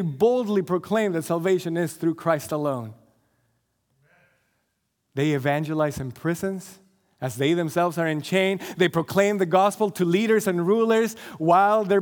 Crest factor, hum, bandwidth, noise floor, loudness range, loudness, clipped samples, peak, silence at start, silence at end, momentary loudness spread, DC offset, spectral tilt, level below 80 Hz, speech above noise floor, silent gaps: 18 dB; none; 19.5 kHz; -75 dBFS; 9 LU; -23 LUFS; under 0.1%; -6 dBFS; 0 s; 0 s; 8 LU; under 0.1%; -6 dB/octave; -64 dBFS; 52 dB; none